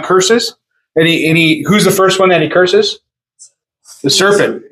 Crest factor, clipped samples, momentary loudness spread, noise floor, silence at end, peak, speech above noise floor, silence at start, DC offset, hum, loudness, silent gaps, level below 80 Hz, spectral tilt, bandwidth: 12 dB; under 0.1%; 9 LU; -44 dBFS; 0.1 s; 0 dBFS; 34 dB; 0 s; under 0.1%; none; -10 LUFS; none; -54 dBFS; -4 dB/octave; 16 kHz